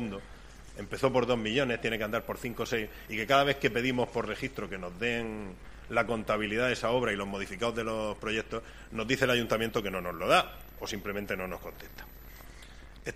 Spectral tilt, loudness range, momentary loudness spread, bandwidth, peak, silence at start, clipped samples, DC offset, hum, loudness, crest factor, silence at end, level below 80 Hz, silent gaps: -4.5 dB/octave; 2 LU; 20 LU; 15.5 kHz; -8 dBFS; 0 s; under 0.1%; under 0.1%; none; -31 LUFS; 24 dB; 0 s; -50 dBFS; none